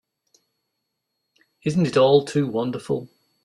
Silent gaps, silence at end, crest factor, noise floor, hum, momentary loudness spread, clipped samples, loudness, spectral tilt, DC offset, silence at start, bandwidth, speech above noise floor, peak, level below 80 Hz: none; 0.4 s; 20 dB; -79 dBFS; none; 12 LU; under 0.1%; -21 LUFS; -6.5 dB/octave; under 0.1%; 1.65 s; 11.5 kHz; 58 dB; -4 dBFS; -62 dBFS